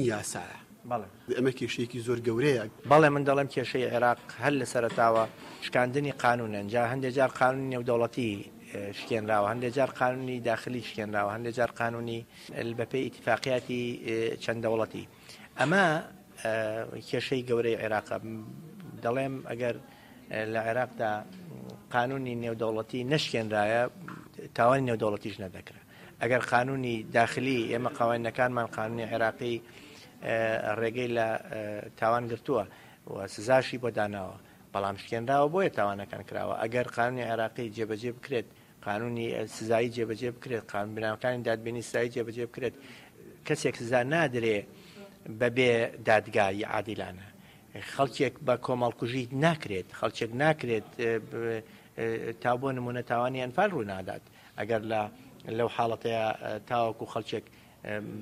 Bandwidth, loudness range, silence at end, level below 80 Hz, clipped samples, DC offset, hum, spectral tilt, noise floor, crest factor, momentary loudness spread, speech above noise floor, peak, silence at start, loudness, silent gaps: 15.5 kHz; 5 LU; 0 s; -66 dBFS; under 0.1%; under 0.1%; none; -5.5 dB/octave; -49 dBFS; 22 dB; 14 LU; 19 dB; -10 dBFS; 0 s; -30 LUFS; none